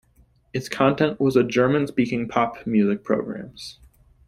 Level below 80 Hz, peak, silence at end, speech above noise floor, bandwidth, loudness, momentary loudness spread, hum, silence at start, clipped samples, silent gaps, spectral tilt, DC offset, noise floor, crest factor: -56 dBFS; -4 dBFS; 0.55 s; 37 dB; 14.5 kHz; -22 LUFS; 14 LU; none; 0.55 s; under 0.1%; none; -6.5 dB/octave; under 0.1%; -59 dBFS; 20 dB